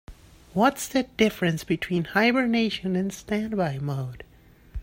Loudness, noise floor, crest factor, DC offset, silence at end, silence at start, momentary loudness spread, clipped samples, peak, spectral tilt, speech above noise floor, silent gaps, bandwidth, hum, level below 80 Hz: -25 LUFS; -48 dBFS; 18 dB; under 0.1%; 0 s; 0.1 s; 11 LU; under 0.1%; -8 dBFS; -5.5 dB/octave; 23 dB; none; 16.5 kHz; none; -52 dBFS